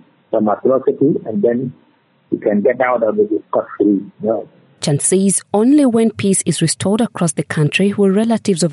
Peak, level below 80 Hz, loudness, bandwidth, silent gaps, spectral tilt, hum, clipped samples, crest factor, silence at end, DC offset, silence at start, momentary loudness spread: -2 dBFS; -62 dBFS; -15 LUFS; 11.5 kHz; none; -5 dB/octave; none; under 0.1%; 14 dB; 0 s; under 0.1%; 0.3 s; 8 LU